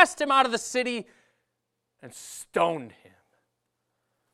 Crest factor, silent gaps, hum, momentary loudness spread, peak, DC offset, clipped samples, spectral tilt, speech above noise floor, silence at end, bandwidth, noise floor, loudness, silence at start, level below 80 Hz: 26 dB; none; none; 21 LU; -2 dBFS; under 0.1%; under 0.1%; -2.5 dB/octave; 53 dB; 1.45 s; 15.5 kHz; -81 dBFS; -25 LUFS; 0 s; -72 dBFS